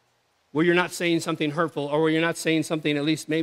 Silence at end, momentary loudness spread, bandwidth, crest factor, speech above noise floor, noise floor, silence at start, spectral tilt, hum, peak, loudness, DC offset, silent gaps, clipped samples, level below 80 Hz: 0 s; 4 LU; 15.5 kHz; 18 dB; 44 dB; -68 dBFS; 0.55 s; -5 dB/octave; none; -6 dBFS; -24 LUFS; under 0.1%; none; under 0.1%; -76 dBFS